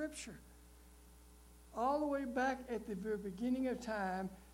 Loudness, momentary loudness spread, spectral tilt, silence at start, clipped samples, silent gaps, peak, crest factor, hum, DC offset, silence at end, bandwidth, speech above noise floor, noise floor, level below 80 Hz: -40 LUFS; 12 LU; -5.5 dB/octave; 0 s; under 0.1%; none; -24 dBFS; 18 dB; none; under 0.1%; 0 s; 16.5 kHz; 21 dB; -61 dBFS; -62 dBFS